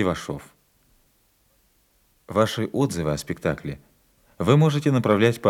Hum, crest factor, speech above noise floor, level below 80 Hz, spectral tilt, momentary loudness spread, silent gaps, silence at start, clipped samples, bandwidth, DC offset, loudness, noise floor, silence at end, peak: none; 20 dB; 42 dB; -54 dBFS; -6.5 dB/octave; 16 LU; none; 0 s; under 0.1%; 15.5 kHz; under 0.1%; -23 LUFS; -64 dBFS; 0 s; -4 dBFS